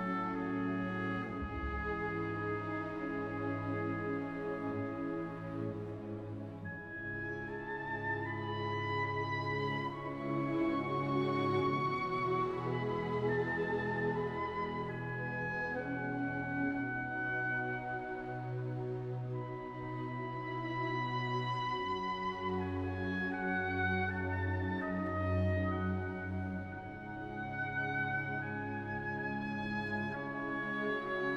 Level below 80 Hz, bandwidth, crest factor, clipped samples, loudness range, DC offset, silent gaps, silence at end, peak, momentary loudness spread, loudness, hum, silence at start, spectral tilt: -58 dBFS; 8 kHz; 14 dB; under 0.1%; 5 LU; under 0.1%; none; 0 s; -22 dBFS; 7 LU; -37 LUFS; none; 0 s; -8 dB/octave